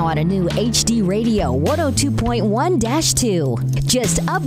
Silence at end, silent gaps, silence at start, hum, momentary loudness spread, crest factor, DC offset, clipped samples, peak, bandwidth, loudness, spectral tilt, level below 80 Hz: 0 s; none; 0 s; none; 2 LU; 14 dB; under 0.1%; under 0.1%; -4 dBFS; 16 kHz; -17 LUFS; -4.5 dB/octave; -32 dBFS